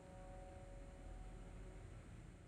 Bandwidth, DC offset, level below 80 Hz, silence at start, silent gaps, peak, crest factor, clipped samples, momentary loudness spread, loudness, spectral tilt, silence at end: 11 kHz; under 0.1%; -58 dBFS; 0 s; none; -44 dBFS; 10 dB; under 0.1%; 1 LU; -58 LUFS; -6.5 dB/octave; 0 s